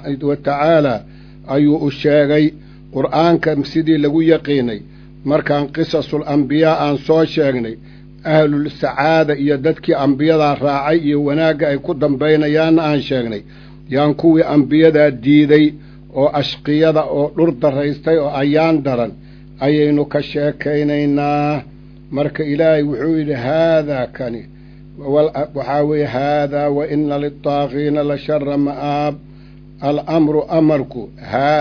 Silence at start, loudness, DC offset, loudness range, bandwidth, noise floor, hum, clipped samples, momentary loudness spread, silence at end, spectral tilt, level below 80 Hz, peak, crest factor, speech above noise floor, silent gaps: 0 s; -15 LUFS; under 0.1%; 4 LU; 5.4 kHz; -39 dBFS; none; under 0.1%; 9 LU; 0 s; -8.5 dB/octave; -44 dBFS; 0 dBFS; 16 dB; 24 dB; none